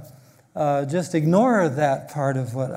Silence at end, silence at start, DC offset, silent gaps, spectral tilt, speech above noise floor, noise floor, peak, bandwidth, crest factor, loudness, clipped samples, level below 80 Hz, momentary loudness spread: 0 s; 0 s; under 0.1%; none; -7 dB/octave; 28 dB; -49 dBFS; -4 dBFS; 16 kHz; 18 dB; -22 LUFS; under 0.1%; -66 dBFS; 8 LU